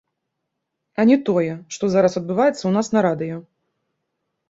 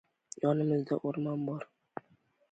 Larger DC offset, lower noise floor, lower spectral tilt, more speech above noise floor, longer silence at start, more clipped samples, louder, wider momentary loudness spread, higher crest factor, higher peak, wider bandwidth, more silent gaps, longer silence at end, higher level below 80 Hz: neither; first, -78 dBFS vs -69 dBFS; second, -6.5 dB/octave vs -8 dB/octave; first, 60 dB vs 38 dB; first, 1 s vs 0.4 s; neither; first, -19 LUFS vs -33 LUFS; second, 11 LU vs 18 LU; about the same, 18 dB vs 18 dB; first, -4 dBFS vs -16 dBFS; second, 8 kHz vs 9.2 kHz; neither; first, 1.1 s vs 0.9 s; first, -62 dBFS vs -78 dBFS